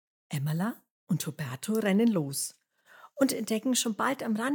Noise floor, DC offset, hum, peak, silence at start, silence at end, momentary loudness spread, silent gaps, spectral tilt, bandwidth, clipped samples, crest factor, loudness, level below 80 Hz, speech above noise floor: -56 dBFS; under 0.1%; none; -12 dBFS; 0.3 s; 0 s; 11 LU; 0.90-1.07 s; -4.5 dB/octave; 19.5 kHz; under 0.1%; 18 dB; -30 LUFS; -84 dBFS; 28 dB